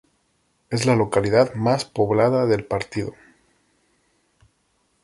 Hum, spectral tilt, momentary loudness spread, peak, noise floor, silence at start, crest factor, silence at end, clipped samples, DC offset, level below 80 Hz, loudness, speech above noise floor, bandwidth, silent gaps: none; -6 dB/octave; 10 LU; -4 dBFS; -67 dBFS; 0.7 s; 18 dB; 1.9 s; under 0.1%; under 0.1%; -52 dBFS; -21 LUFS; 47 dB; 11.5 kHz; none